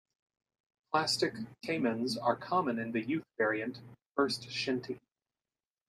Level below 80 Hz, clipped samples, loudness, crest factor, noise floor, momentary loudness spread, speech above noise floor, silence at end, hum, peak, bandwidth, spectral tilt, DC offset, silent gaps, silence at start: -76 dBFS; under 0.1%; -33 LUFS; 22 dB; under -90 dBFS; 10 LU; over 57 dB; 0.9 s; none; -14 dBFS; 14.5 kHz; -4 dB/octave; under 0.1%; 4.06-4.15 s; 0.9 s